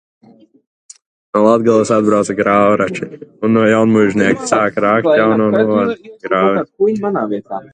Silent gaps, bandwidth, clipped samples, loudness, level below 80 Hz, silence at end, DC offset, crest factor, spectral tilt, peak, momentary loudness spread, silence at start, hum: none; 9.6 kHz; under 0.1%; -13 LUFS; -54 dBFS; 0.1 s; under 0.1%; 14 dB; -6 dB/octave; 0 dBFS; 9 LU; 1.35 s; none